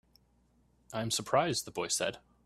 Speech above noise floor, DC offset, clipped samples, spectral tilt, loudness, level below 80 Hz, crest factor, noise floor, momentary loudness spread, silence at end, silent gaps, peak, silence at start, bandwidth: 36 dB; under 0.1%; under 0.1%; -3 dB/octave; -33 LUFS; -68 dBFS; 22 dB; -69 dBFS; 8 LU; 0.25 s; none; -14 dBFS; 0.9 s; 15 kHz